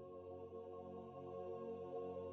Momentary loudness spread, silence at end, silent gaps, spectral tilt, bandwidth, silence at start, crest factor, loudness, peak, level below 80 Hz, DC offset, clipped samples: 5 LU; 0 s; none; -8 dB/octave; 6.4 kHz; 0 s; 12 dB; -51 LUFS; -38 dBFS; -86 dBFS; under 0.1%; under 0.1%